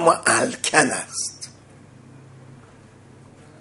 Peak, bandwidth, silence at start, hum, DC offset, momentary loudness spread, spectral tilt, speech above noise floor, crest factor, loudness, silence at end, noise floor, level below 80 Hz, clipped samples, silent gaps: 0 dBFS; 11.5 kHz; 0 s; none; under 0.1%; 17 LU; -2 dB/octave; 28 dB; 24 dB; -20 LUFS; 1.05 s; -48 dBFS; -62 dBFS; under 0.1%; none